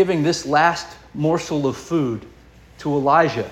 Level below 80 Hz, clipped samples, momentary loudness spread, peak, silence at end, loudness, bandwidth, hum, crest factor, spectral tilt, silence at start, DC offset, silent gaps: -50 dBFS; under 0.1%; 13 LU; -2 dBFS; 0 s; -20 LUFS; 14 kHz; none; 18 dB; -5.5 dB/octave; 0 s; under 0.1%; none